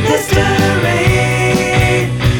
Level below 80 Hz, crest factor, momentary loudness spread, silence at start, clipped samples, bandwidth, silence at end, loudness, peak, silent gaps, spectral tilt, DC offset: -26 dBFS; 12 dB; 1 LU; 0 s; under 0.1%; 18 kHz; 0 s; -12 LUFS; 0 dBFS; none; -5 dB/octave; under 0.1%